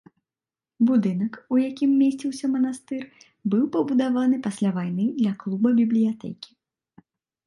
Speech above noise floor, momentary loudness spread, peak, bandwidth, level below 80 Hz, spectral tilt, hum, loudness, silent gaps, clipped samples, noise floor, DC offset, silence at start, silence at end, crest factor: over 67 dB; 13 LU; -10 dBFS; 11.5 kHz; -72 dBFS; -7.5 dB/octave; none; -23 LUFS; none; under 0.1%; under -90 dBFS; under 0.1%; 0.8 s; 1 s; 14 dB